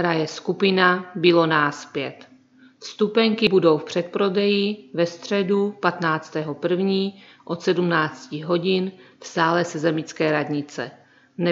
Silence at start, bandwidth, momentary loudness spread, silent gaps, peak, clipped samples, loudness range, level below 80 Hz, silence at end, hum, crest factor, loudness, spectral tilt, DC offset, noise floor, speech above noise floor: 0 s; 7.8 kHz; 13 LU; none; -2 dBFS; under 0.1%; 3 LU; -70 dBFS; 0 s; none; 20 dB; -22 LUFS; -5.5 dB/octave; under 0.1%; -52 dBFS; 31 dB